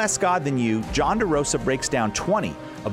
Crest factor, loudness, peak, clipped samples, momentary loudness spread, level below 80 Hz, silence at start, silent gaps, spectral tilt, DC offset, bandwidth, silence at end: 14 dB; -23 LUFS; -10 dBFS; under 0.1%; 3 LU; -42 dBFS; 0 s; none; -4 dB/octave; under 0.1%; 16 kHz; 0 s